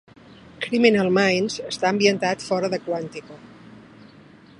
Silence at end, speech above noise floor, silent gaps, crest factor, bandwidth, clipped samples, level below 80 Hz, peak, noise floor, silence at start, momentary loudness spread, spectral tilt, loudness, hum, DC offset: 0.8 s; 27 dB; none; 22 dB; 11 kHz; under 0.1%; -64 dBFS; 0 dBFS; -48 dBFS; 0.6 s; 12 LU; -4.5 dB/octave; -21 LUFS; none; under 0.1%